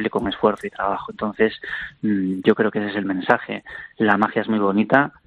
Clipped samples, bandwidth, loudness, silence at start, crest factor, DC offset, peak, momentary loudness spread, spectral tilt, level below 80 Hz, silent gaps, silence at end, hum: under 0.1%; 6 kHz; -21 LUFS; 0 s; 20 dB; under 0.1%; -2 dBFS; 10 LU; -7.5 dB/octave; -54 dBFS; none; 0.15 s; none